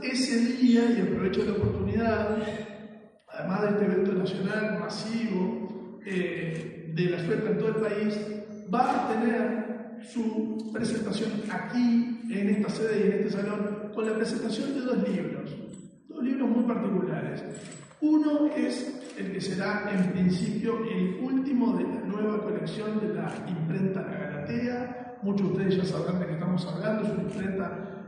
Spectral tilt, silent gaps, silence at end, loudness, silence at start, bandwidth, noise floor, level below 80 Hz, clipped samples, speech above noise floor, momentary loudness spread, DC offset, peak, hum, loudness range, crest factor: -7 dB/octave; none; 0 s; -29 LUFS; 0 s; 10 kHz; -48 dBFS; -60 dBFS; under 0.1%; 21 dB; 10 LU; under 0.1%; -12 dBFS; none; 3 LU; 16 dB